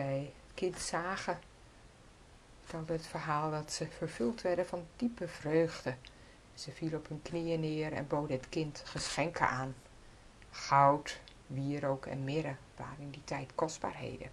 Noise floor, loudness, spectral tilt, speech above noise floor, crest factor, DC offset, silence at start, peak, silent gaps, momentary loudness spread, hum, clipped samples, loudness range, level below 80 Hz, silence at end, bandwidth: -58 dBFS; -36 LUFS; -5 dB/octave; 23 dB; 24 dB; under 0.1%; 0 s; -12 dBFS; none; 14 LU; none; under 0.1%; 5 LU; -60 dBFS; 0 s; 12 kHz